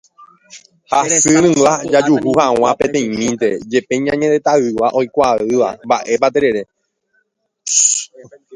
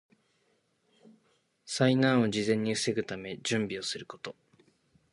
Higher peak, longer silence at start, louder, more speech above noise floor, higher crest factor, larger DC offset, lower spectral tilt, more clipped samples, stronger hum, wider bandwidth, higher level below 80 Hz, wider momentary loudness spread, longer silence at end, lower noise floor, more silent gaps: first, 0 dBFS vs -10 dBFS; second, 0.55 s vs 1.65 s; first, -14 LUFS vs -29 LUFS; first, 50 dB vs 44 dB; second, 16 dB vs 22 dB; neither; second, -3.5 dB/octave vs -5 dB/octave; neither; neither; about the same, 11.5 kHz vs 11.5 kHz; first, -52 dBFS vs -70 dBFS; second, 7 LU vs 15 LU; second, 0 s vs 0.8 s; second, -65 dBFS vs -73 dBFS; neither